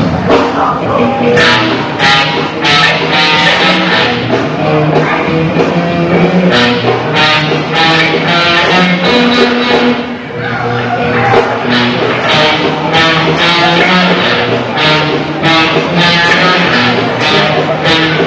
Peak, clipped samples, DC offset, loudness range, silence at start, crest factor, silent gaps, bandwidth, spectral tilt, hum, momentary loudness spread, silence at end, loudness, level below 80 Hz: 0 dBFS; 0.6%; under 0.1%; 2 LU; 0 s; 10 dB; none; 8 kHz; -5 dB/octave; none; 5 LU; 0 s; -8 LUFS; -38 dBFS